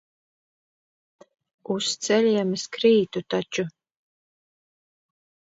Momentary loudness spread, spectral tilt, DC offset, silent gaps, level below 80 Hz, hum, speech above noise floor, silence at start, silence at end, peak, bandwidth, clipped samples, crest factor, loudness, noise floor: 10 LU; -4 dB/octave; under 0.1%; none; -72 dBFS; none; over 67 dB; 1.7 s; 1.75 s; -8 dBFS; 8 kHz; under 0.1%; 20 dB; -24 LUFS; under -90 dBFS